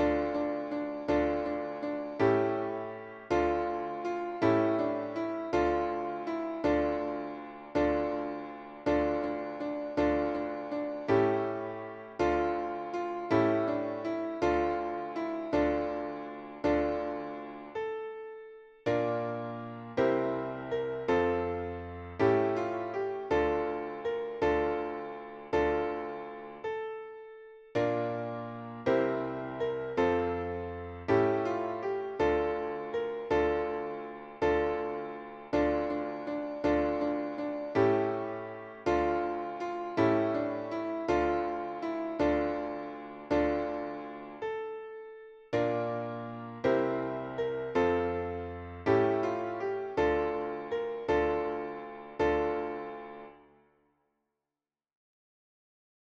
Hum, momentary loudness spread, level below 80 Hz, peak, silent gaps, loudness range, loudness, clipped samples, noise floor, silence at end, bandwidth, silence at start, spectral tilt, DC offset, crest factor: none; 12 LU; -54 dBFS; -14 dBFS; none; 4 LU; -32 LUFS; under 0.1%; under -90 dBFS; 2.75 s; 7.6 kHz; 0 s; -7.5 dB/octave; under 0.1%; 18 dB